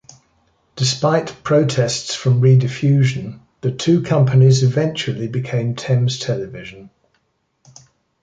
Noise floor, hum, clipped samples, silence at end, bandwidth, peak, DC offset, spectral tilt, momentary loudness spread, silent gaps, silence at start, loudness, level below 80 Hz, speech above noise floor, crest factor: -67 dBFS; none; under 0.1%; 1.35 s; 9.2 kHz; -2 dBFS; under 0.1%; -6 dB/octave; 12 LU; none; 0.75 s; -17 LUFS; -54 dBFS; 51 dB; 16 dB